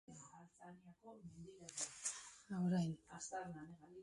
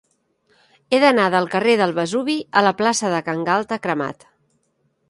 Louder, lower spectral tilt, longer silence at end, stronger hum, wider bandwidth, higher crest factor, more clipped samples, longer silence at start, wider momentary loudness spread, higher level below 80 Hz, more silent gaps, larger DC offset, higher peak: second, -45 LUFS vs -19 LUFS; about the same, -5 dB/octave vs -4 dB/octave; second, 0 s vs 0.95 s; neither; about the same, 11.5 kHz vs 11.5 kHz; about the same, 20 dB vs 18 dB; neither; second, 0.1 s vs 0.9 s; first, 21 LU vs 8 LU; second, -78 dBFS vs -66 dBFS; neither; neither; second, -28 dBFS vs -2 dBFS